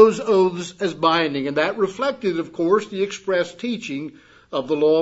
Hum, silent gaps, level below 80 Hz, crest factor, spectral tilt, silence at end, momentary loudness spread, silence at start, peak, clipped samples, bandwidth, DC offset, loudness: none; none; -64 dBFS; 18 dB; -5 dB/octave; 0 s; 10 LU; 0 s; -2 dBFS; under 0.1%; 8 kHz; under 0.1%; -21 LUFS